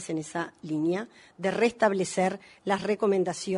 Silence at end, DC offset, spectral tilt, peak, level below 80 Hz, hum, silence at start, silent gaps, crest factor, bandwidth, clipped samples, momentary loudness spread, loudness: 0 s; under 0.1%; -5 dB/octave; -10 dBFS; -70 dBFS; none; 0 s; none; 18 dB; 11 kHz; under 0.1%; 10 LU; -28 LUFS